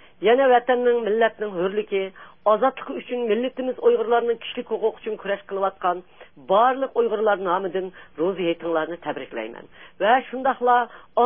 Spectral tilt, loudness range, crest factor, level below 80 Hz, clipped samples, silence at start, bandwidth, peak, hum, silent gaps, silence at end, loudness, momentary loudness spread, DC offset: -9.5 dB/octave; 3 LU; 16 dB; -66 dBFS; under 0.1%; 0.2 s; 3.7 kHz; -6 dBFS; none; none; 0 s; -22 LUFS; 12 LU; 0.3%